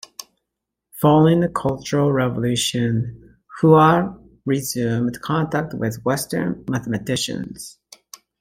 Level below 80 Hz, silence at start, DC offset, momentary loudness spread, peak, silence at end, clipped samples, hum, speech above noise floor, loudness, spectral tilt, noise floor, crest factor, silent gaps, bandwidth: -52 dBFS; 0.95 s; under 0.1%; 15 LU; -2 dBFS; 0.7 s; under 0.1%; none; 62 dB; -20 LUFS; -5.5 dB/octave; -81 dBFS; 18 dB; none; 16.5 kHz